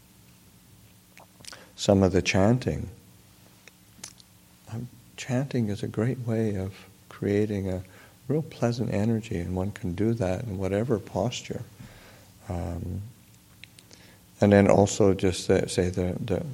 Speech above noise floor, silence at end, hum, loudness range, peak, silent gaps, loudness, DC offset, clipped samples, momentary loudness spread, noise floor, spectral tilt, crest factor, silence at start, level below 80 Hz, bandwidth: 30 dB; 0 s; none; 9 LU; -4 dBFS; none; -26 LUFS; under 0.1%; under 0.1%; 23 LU; -55 dBFS; -6 dB/octave; 24 dB; 1.15 s; -52 dBFS; 16.5 kHz